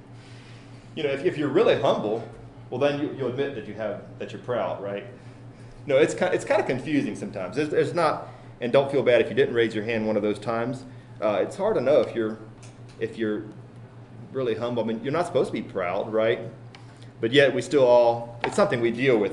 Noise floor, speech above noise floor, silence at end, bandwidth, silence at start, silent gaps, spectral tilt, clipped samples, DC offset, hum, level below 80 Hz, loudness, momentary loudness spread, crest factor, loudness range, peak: -45 dBFS; 21 dB; 0 s; 11 kHz; 0.05 s; none; -6 dB/octave; under 0.1%; under 0.1%; none; -58 dBFS; -24 LUFS; 24 LU; 20 dB; 6 LU; -4 dBFS